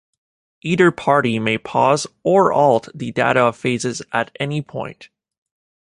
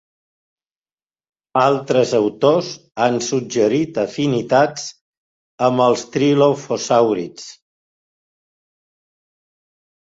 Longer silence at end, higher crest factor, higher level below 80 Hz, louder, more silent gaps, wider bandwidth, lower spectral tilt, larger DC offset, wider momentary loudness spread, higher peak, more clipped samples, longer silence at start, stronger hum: second, 0.85 s vs 2.65 s; about the same, 18 dB vs 18 dB; about the same, -58 dBFS vs -62 dBFS; about the same, -18 LUFS vs -17 LUFS; second, none vs 5.01-5.58 s; first, 11.5 kHz vs 8 kHz; about the same, -5.5 dB/octave vs -5 dB/octave; neither; about the same, 11 LU vs 10 LU; about the same, -2 dBFS vs 0 dBFS; neither; second, 0.65 s vs 1.55 s; neither